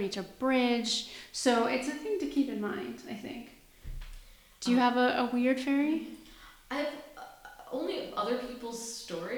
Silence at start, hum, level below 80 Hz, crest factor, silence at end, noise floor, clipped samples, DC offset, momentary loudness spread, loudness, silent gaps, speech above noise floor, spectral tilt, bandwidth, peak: 0 s; none; -54 dBFS; 20 dB; 0 s; -54 dBFS; under 0.1%; under 0.1%; 21 LU; -31 LUFS; none; 23 dB; -3.5 dB/octave; 20 kHz; -12 dBFS